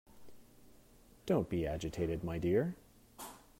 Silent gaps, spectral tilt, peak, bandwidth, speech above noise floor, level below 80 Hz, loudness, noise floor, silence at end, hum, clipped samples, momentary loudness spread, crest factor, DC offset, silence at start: none; -7 dB/octave; -20 dBFS; 16 kHz; 27 dB; -56 dBFS; -36 LUFS; -62 dBFS; 0.2 s; none; under 0.1%; 17 LU; 18 dB; under 0.1%; 0.15 s